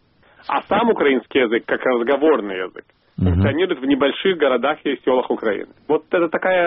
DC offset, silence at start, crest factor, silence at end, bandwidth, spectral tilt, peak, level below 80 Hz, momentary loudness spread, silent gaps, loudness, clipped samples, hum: under 0.1%; 0.5 s; 14 dB; 0 s; 5.4 kHz; -4.5 dB/octave; -4 dBFS; -44 dBFS; 7 LU; none; -19 LUFS; under 0.1%; none